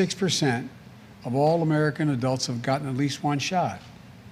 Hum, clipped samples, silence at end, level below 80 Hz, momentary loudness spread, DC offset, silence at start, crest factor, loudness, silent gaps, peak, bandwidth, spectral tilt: none; under 0.1%; 0 s; -62 dBFS; 9 LU; under 0.1%; 0 s; 16 dB; -25 LUFS; none; -10 dBFS; 15 kHz; -5 dB/octave